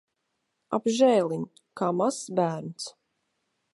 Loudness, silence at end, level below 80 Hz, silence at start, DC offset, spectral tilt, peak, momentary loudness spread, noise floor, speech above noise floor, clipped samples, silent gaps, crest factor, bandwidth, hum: -26 LUFS; 0.85 s; -76 dBFS; 0.7 s; under 0.1%; -5.5 dB/octave; -10 dBFS; 17 LU; -79 dBFS; 53 dB; under 0.1%; none; 18 dB; 11.5 kHz; none